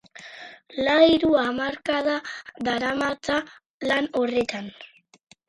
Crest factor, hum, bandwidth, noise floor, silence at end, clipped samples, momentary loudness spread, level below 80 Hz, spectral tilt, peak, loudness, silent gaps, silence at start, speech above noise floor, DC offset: 20 dB; none; 11.5 kHz; -44 dBFS; 0.6 s; under 0.1%; 22 LU; -56 dBFS; -4.5 dB/octave; -4 dBFS; -23 LUFS; 3.66-3.80 s; 0.15 s; 20 dB; under 0.1%